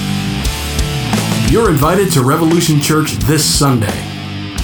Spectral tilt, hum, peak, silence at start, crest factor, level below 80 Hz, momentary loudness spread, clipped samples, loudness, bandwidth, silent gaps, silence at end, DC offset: -4.5 dB/octave; none; 0 dBFS; 0 s; 14 dB; -26 dBFS; 8 LU; under 0.1%; -13 LUFS; over 20 kHz; none; 0 s; under 0.1%